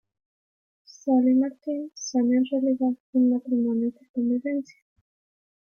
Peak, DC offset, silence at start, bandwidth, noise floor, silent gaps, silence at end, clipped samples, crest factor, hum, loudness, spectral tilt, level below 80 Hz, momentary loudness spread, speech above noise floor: -12 dBFS; under 0.1%; 1.05 s; 6.8 kHz; under -90 dBFS; 3.00-3.13 s, 4.09-4.14 s; 1.15 s; under 0.1%; 14 dB; none; -25 LUFS; -5.5 dB/octave; -76 dBFS; 10 LU; over 66 dB